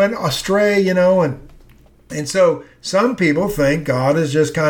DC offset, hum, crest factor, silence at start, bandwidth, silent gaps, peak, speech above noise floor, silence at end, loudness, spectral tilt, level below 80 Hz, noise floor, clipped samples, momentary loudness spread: under 0.1%; none; 14 dB; 0 s; 19 kHz; none; -4 dBFS; 31 dB; 0 s; -16 LUFS; -5.5 dB/octave; -44 dBFS; -47 dBFS; under 0.1%; 8 LU